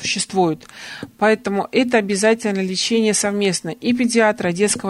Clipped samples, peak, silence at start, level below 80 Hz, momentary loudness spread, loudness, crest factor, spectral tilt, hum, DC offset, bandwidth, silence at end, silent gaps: under 0.1%; -4 dBFS; 0 s; -58 dBFS; 6 LU; -18 LUFS; 16 dB; -3.5 dB/octave; none; under 0.1%; 14 kHz; 0 s; none